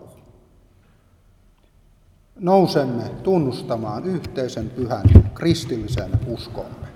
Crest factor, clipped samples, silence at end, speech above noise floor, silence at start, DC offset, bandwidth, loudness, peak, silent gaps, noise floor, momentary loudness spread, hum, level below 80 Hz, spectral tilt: 20 dB; under 0.1%; 0.05 s; 36 dB; 2.4 s; under 0.1%; 12.5 kHz; -20 LUFS; 0 dBFS; none; -55 dBFS; 14 LU; none; -30 dBFS; -7.5 dB/octave